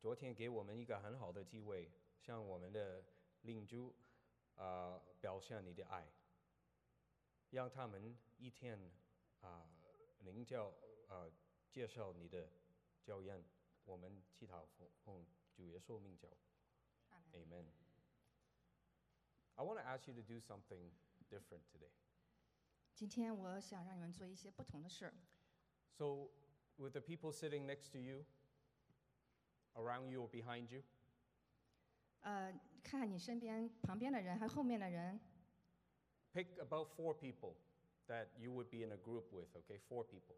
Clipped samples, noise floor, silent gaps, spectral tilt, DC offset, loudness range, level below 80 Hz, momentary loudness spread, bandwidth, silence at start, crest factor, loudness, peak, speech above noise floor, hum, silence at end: under 0.1%; -84 dBFS; none; -6.5 dB/octave; under 0.1%; 13 LU; -84 dBFS; 16 LU; 13 kHz; 0 s; 20 dB; -52 LUFS; -32 dBFS; 32 dB; none; 0 s